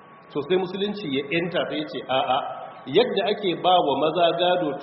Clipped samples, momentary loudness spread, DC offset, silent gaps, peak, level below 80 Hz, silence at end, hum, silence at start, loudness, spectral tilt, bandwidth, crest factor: under 0.1%; 9 LU; under 0.1%; none; -6 dBFS; -66 dBFS; 0 s; none; 0.1 s; -23 LUFS; -2.5 dB/octave; 5.8 kHz; 18 dB